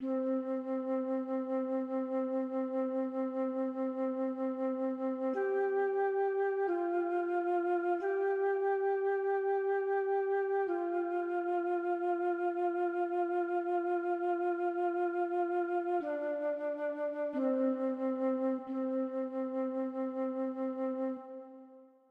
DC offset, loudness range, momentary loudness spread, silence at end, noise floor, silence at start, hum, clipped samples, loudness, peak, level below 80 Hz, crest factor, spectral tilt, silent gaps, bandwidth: under 0.1%; 3 LU; 4 LU; 0.25 s; -57 dBFS; 0 s; none; under 0.1%; -34 LUFS; -22 dBFS; -88 dBFS; 12 dB; -7 dB/octave; none; 4.4 kHz